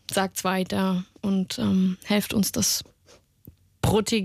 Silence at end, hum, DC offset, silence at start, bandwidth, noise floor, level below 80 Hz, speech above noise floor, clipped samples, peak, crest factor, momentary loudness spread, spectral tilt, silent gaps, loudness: 0 s; none; under 0.1%; 0.1 s; 16 kHz; -57 dBFS; -50 dBFS; 33 dB; under 0.1%; -10 dBFS; 14 dB; 5 LU; -4.5 dB/octave; none; -25 LUFS